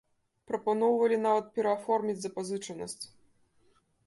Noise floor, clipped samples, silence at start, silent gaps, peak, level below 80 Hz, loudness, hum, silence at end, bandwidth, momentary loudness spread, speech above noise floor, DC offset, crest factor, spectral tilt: -68 dBFS; under 0.1%; 0.5 s; none; -14 dBFS; -74 dBFS; -30 LUFS; none; 1 s; 11.5 kHz; 13 LU; 38 dB; under 0.1%; 16 dB; -5 dB/octave